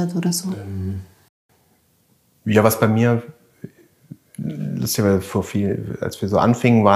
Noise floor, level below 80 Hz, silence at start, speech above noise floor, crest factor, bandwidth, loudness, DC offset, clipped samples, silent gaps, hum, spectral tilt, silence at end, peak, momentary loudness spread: -61 dBFS; -54 dBFS; 0 s; 42 dB; 20 dB; 15.5 kHz; -20 LUFS; under 0.1%; under 0.1%; 1.29-1.49 s; none; -6 dB/octave; 0 s; 0 dBFS; 18 LU